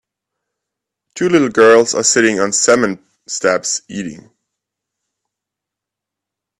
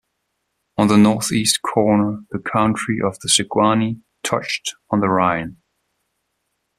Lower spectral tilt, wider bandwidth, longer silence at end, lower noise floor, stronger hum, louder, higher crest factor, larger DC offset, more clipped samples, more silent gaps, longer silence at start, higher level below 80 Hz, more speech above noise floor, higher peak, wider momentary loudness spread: about the same, -3 dB/octave vs -4 dB/octave; second, 12 kHz vs 14.5 kHz; first, 2.45 s vs 1.25 s; first, -83 dBFS vs -73 dBFS; neither; first, -13 LUFS vs -18 LUFS; about the same, 16 dB vs 18 dB; neither; neither; neither; first, 1.15 s vs 0.8 s; about the same, -58 dBFS vs -54 dBFS; first, 70 dB vs 55 dB; about the same, 0 dBFS vs 0 dBFS; first, 17 LU vs 10 LU